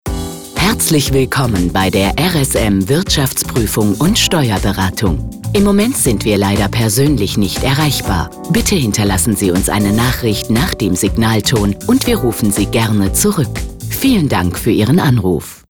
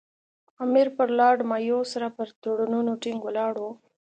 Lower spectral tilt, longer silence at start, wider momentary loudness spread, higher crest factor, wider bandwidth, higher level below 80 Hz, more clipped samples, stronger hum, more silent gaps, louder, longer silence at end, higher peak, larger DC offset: about the same, -4.5 dB/octave vs -5 dB/octave; second, 0.05 s vs 0.6 s; second, 5 LU vs 11 LU; second, 10 dB vs 18 dB; first, over 20 kHz vs 9 kHz; first, -28 dBFS vs -82 dBFS; neither; neither; second, none vs 2.36-2.42 s; first, -13 LUFS vs -25 LUFS; second, 0.15 s vs 0.35 s; first, -4 dBFS vs -8 dBFS; first, 0.7% vs under 0.1%